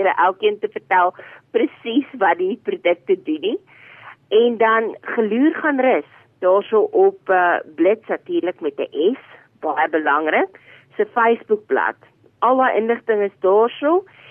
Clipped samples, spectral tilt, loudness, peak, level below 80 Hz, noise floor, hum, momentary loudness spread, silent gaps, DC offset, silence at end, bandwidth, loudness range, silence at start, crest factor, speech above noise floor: under 0.1%; -8 dB/octave; -19 LUFS; -6 dBFS; -74 dBFS; -43 dBFS; none; 8 LU; none; under 0.1%; 0.3 s; 3.6 kHz; 3 LU; 0 s; 14 dB; 25 dB